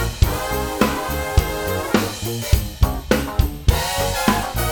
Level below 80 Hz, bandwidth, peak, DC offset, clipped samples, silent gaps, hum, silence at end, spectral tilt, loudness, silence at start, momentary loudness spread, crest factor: -24 dBFS; 19.5 kHz; 0 dBFS; 0.2%; under 0.1%; none; none; 0 s; -5 dB/octave; -21 LUFS; 0 s; 4 LU; 18 dB